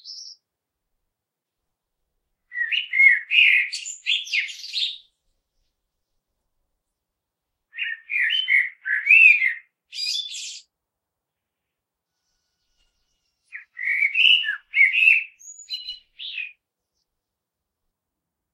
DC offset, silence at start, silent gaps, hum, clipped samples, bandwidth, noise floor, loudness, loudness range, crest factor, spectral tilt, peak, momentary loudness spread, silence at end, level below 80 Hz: under 0.1%; 0.05 s; none; none; under 0.1%; 13.5 kHz; -84 dBFS; -17 LUFS; 15 LU; 22 dB; 7 dB/octave; -2 dBFS; 21 LU; 2.05 s; -74 dBFS